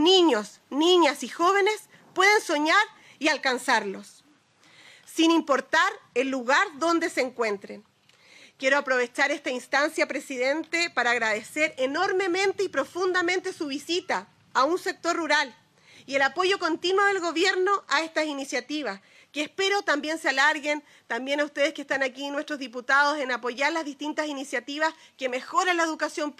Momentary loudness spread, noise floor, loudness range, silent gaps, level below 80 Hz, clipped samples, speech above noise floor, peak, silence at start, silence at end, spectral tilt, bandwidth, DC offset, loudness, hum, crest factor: 10 LU; -60 dBFS; 3 LU; none; -80 dBFS; under 0.1%; 35 dB; -8 dBFS; 0 s; 0.05 s; -1.5 dB/octave; 14.5 kHz; under 0.1%; -25 LUFS; none; 18 dB